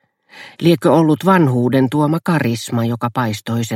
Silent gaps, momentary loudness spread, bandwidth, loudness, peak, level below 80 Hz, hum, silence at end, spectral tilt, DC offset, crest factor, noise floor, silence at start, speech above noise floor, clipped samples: none; 7 LU; 16.5 kHz; -16 LUFS; 0 dBFS; -56 dBFS; none; 0 s; -6.5 dB/octave; under 0.1%; 16 dB; -41 dBFS; 0.35 s; 26 dB; under 0.1%